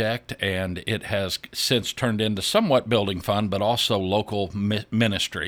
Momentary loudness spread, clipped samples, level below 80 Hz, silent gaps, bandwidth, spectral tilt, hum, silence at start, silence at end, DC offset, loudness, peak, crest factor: 6 LU; under 0.1%; -52 dBFS; none; over 20 kHz; -4.5 dB/octave; none; 0 s; 0 s; under 0.1%; -24 LUFS; -6 dBFS; 18 dB